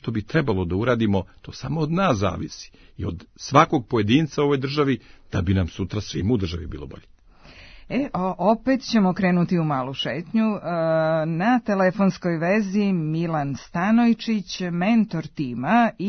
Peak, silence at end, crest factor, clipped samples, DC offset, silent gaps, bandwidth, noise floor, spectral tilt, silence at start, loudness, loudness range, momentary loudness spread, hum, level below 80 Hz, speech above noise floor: 0 dBFS; 0 s; 22 dB; under 0.1%; under 0.1%; none; 6.6 kHz; -48 dBFS; -7 dB/octave; 0.05 s; -22 LUFS; 4 LU; 11 LU; none; -48 dBFS; 26 dB